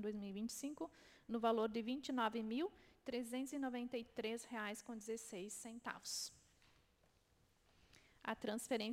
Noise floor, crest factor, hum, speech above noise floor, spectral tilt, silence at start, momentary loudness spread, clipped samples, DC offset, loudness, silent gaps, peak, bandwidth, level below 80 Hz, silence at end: -76 dBFS; 22 dB; none; 31 dB; -3.5 dB/octave; 0 s; 10 LU; under 0.1%; under 0.1%; -45 LUFS; none; -24 dBFS; 16.5 kHz; -78 dBFS; 0 s